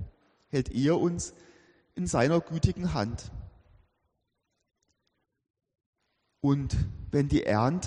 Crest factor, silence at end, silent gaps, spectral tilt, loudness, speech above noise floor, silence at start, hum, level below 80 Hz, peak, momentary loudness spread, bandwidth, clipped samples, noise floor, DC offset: 20 dB; 0 s; 5.50-5.54 s, 5.86-5.93 s; -6.5 dB/octave; -29 LUFS; 53 dB; 0 s; none; -44 dBFS; -10 dBFS; 15 LU; 10 kHz; under 0.1%; -80 dBFS; under 0.1%